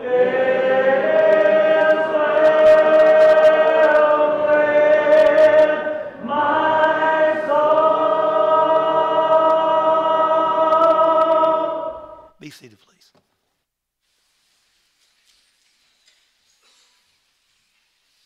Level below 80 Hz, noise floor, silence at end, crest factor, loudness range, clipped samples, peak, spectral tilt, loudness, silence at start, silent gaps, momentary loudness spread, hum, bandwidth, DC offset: -62 dBFS; -77 dBFS; 5.75 s; 12 dB; 6 LU; under 0.1%; -6 dBFS; -5.5 dB/octave; -15 LUFS; 0 s; none; 6 LU; none; 6.6 kHz; under 0.1%